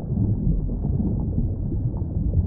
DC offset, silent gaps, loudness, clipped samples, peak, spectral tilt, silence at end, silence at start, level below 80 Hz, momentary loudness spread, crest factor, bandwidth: under 0.1%; none; -25 LUFS; under 0.1%; -10 dBFS; -17 dB/octave; 0 s; 0 s; -28 dBFS; 4 LU; 12 dB; 1.4 kHz